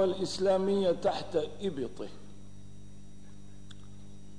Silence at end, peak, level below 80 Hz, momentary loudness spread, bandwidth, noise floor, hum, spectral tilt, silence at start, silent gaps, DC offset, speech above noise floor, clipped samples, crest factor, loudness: 0 s; -16 dBFS; -60 dBFS; 25 LU; 10.5 kHz; -52 dBFS; 50 Hz at -55 dBFS; -5.5 dB/octave; 0 s; none; 0.8%; 21 dB; under 0.1%; 16 dB; -31 LUFS